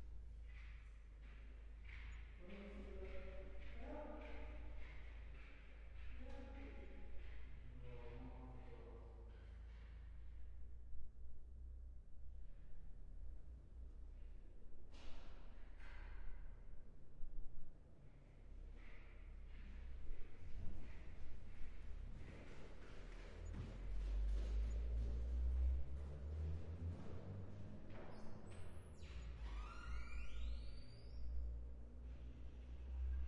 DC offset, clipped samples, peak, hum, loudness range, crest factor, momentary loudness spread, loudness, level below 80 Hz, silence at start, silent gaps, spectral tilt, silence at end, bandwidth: under 0.1%; under 0.1%; -32 dBFS; none; 14 LU; 16 dB; 15 LU; -54 LUFS; -52 dBFS; 0 s; none; -7 dB/octave; 0 s; 7.4 kHz